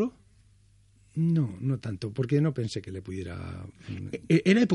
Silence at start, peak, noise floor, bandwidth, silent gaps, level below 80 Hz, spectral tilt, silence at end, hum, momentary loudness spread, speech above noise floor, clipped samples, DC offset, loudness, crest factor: 0 s; -10 dBFS; -60 dBFS; 11.5 kHz; none; -62 dBFS; -7.5 dB/octave; 0 s; none; 15 LU; 33 dB; under 0.1%; under 0.1%; -29 LUFS; 18 dB